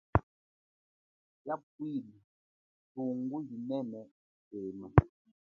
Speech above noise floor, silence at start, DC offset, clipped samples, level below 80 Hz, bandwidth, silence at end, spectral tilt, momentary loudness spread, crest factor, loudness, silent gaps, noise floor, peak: over 56 dB; 0.15 s; under 0.1%; under 0.1%; -48 dBFS; 4.2 kHz; 0.4 s; -9 dB/octave; 21 LU; 34 dB; -35 LUFS; 0.23-1.45 s, 1.63-1.79 s, 2.24-2.95 s, 4.11-4.51 s; under -90 dBFS; -2 dBFS